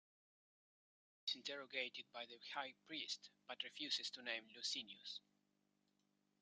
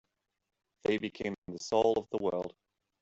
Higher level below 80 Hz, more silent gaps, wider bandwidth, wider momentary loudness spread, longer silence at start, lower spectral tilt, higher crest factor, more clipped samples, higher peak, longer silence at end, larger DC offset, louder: second, under -90 dBFS vs -68 dBFS; second, none vs 1.38-1.42 s; first, 11.5 kHz vs 8 kHz; about the same, 9 LU vs 11 LU; first, 1.25 s vs 0.9 s; second, 0 dB/octave vs -5 dB/octave; about the same, 24 dB vs 20 dB; neither; second, -28 dBFS vs -14 dBFS; first, 1.2 s vs 0.5 s; neither; second, -48 LUFS vs -33 LUFS